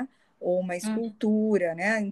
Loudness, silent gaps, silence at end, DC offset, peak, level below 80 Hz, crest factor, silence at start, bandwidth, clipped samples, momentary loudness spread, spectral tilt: -27 LUFS; none; 0 s; under 0.1%; -12 dBFS; -74 dBFS; 14 dB; 0 s; 12.5 kHz; under 0.1%; 8 LU; -6 dB/octave